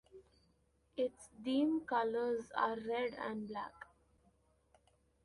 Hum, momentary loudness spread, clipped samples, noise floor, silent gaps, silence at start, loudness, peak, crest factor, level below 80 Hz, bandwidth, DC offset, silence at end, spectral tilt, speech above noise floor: none; 14 LU; under 0.1%; -75 dBFS; none; 0.15 s; -38 LUFS; -20 dBFS; 20 dB; -74 dBFS; 11.5 kHz; under 0.1%; 1.4 s; -5.5 dB/octave; 37 dB